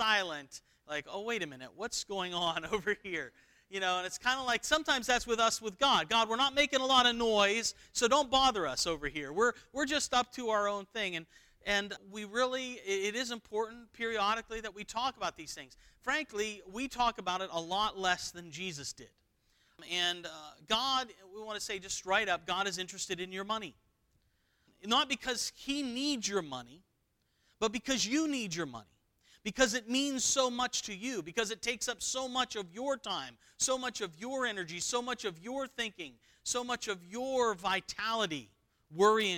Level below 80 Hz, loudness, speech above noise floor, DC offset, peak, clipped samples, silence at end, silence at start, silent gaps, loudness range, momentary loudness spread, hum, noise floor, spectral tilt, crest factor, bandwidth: -62 dBFS; -33 LUFS; 43 dB; under 0.1%; -12 dBFS; under 0.1%; 0 s; 0 s; none; 8 LU; 13 LU; none; -77 dBFS; -1.5 dB/octave; 22 dB; 18.5 kHz